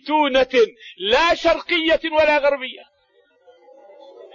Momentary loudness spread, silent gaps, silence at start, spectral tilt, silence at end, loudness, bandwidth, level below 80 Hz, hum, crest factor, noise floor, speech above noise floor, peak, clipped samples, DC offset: 8 LU; none; 0.05 s; -3 dB/octave; 0.1 s; -18 LUFS; 7.4 kHz; -48 dBFS; none; 14 dB; -60 dBFS; 41 dB; -6 dBFS; under 0.1%; under 0.1%